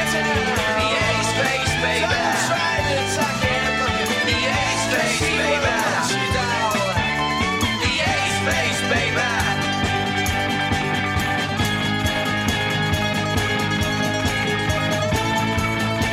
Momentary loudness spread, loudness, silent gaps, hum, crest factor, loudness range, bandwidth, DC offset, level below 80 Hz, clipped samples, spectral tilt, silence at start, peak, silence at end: 2 LU; -20 LUFS; none; none; 14 dB; 1 LU; 16 kHz; under 0.1%; -40 dBFS; under 0.1%; -3.5 dB/octave; 0 s; -6 dBFS; 0 s